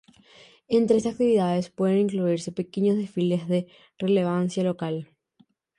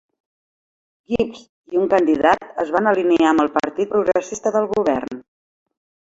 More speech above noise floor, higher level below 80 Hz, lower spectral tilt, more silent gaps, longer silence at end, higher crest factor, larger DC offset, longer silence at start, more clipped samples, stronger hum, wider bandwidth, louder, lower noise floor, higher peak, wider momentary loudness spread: second, 40 dB vs over 72 dB; second, -66 dBFS vs -54 dBFS; first, -7.5 dB/octave vs -5 dB/octave; second, none vs 1.49-1.64 s; about the same, 0.75 s vs 0.85 s; about the same, 16 dB vs 18 dB; neither; second, 0.7 s vs 1.1 s; neither; neither; first, 11 kHz vs 8 kHz; second, -25 LUFS vs -19 LUFS; second, -63 dBFS vs under -90 dBFS; second, -8 dBFS vs -2 dBFS; about the same, 9 LU vs 9 LU